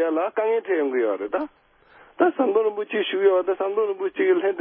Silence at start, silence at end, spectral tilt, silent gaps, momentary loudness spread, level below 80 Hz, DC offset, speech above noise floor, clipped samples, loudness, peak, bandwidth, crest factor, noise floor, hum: 0 s; 0 s; -8.5 dB/octave; none; 6 LU; -72 dBFS; under 0.1%; 31 dB; under 0.1%; -23 LUFS; -6 dBFS; 3.7 kHz; 16 dB; -53 dBFS; none